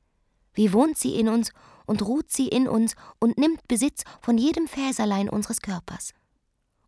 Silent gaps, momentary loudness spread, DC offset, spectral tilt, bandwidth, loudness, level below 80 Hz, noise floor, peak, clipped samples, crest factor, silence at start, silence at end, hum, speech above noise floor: none; 11 LU; under 0.1%; -4.5 dB/octave; 11 kHz; -24 LUFS; -54 dBFS; -72 dBFS; -8 dBFS; under 0.1%; 18 dB; 0.55 s; 0.8 s; none; 48 dB